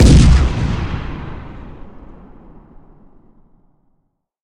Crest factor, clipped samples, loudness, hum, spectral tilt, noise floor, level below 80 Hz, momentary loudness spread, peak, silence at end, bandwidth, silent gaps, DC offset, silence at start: 16 dB; under 0.1%; -15 LUFS; none; -6.5 dB/octave; -66 dBFS; -18 dBFS; 27 LU; 0 dBFS; 2.55 s; 10.5 kHz; none; under 0.1%; 0 s